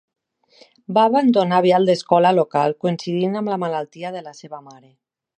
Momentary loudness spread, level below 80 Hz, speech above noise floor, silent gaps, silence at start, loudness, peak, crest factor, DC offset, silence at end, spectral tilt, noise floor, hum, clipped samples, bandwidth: 19 LU; -72 dBFS; 35 dB; none; 0.9 s; -18 LUFS; -2 dBFS; 18 dB; under 0.1%; 0.7 s; -6.5 dB/octave; -53 dBFS; none; under 0.1%; 9.8 kHz